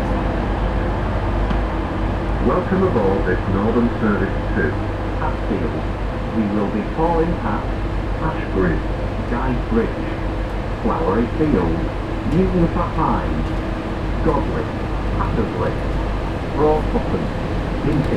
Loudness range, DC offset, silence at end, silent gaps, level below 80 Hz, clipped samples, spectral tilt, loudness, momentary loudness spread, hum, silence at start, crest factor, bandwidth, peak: 2 LU; under 0.1%; 0 s; none; -26 dBFS; under 0.1%; -8.5 dB/octave; -21 LUFS; 6 LU; none; 0 s; 16 dB; 9.2 kHz; -4 dBFS